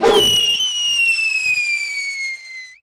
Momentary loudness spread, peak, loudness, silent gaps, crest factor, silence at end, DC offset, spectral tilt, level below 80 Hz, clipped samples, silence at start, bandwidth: 13 LU; -6 dBFS; -15 LUFS; none; 12 dB; 0.1 s; under 0.1%; -0.5 dB/octave; -48 dBFS; under 0.1%; 0 s; 16.5 kHz